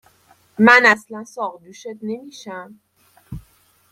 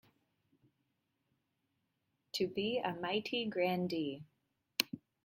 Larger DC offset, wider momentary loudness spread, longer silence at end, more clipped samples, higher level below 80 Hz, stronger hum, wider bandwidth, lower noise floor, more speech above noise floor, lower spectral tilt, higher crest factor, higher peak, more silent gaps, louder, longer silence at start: neither; first, 27 LU vs 6 LU; first, 0.5 s vs 0.3 s; neither; first, -54 dBFS vs -80 dBFS; neither; about the same, 15 kHz vs 16.5 kHz; second, -56 dBFS vs -83 dBFS; second, 38 dB vs 47 dB; about the same, -4.5 dB/octave vs -4.5 dB/octave; second, 20 dB vs 32 dB; first, 0 dBFS vs -10 dBFS; neither; first, -15 LUFS vs -37 LUFS; second, 0.6 s vs 2.35 s